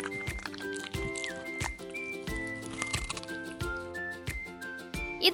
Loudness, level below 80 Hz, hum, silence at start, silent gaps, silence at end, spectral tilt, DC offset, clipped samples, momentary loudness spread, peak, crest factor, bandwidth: -36 LUFS; -48 dBFS; none; 0 s; none; 0 s; -3 dB/octave; under 0.1%; under 0.1%; 5 LU; -8 dBFS; 28 dB; 18 kHz